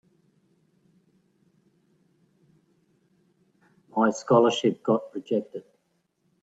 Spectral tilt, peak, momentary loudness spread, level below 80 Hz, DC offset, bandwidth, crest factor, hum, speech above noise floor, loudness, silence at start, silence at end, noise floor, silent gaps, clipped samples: -5.5 dB/octave; -4 dBFS; 13 LU; -74 dBFS; under 0.1%; 8 kHz; 24 dB; none; 49 dB; -24 LUFS; 3.95 s; 0.85 s; -73 dBFS; none; under 0.1%